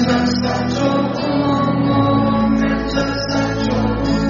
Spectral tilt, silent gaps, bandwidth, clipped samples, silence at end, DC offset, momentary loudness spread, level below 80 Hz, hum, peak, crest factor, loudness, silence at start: -5.5 dB/octave; none; 7.2 kHz; under 0.1%; 0 s; under 0.1%; 4 LU; -32 dBFS; none; -4 dBFS; 12 dB; -17 LUFS; 0 s